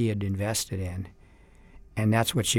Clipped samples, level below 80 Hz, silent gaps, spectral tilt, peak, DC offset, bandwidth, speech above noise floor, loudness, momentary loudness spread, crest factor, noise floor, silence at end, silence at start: under 0.1%; -52 dBFS; none; -4.5 dB/octave; -10 dBFS; under 0.1%; 17.5 kHz; 27 dB; -28 LUFS; 14 LU; 18 dB; -53 dBFS; 0 s; 0 s